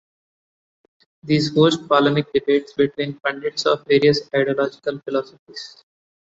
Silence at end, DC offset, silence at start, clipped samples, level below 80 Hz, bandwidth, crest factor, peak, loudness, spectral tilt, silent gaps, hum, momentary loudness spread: 0.75 s; under 0.1%; 1.25 s; under 0.1%; -60 dBFS; 8 kHz; 20 dB; -2 dBFS; -19 LUFS; -6 dB/octave; 5.39-5.46 s; none; 19 LU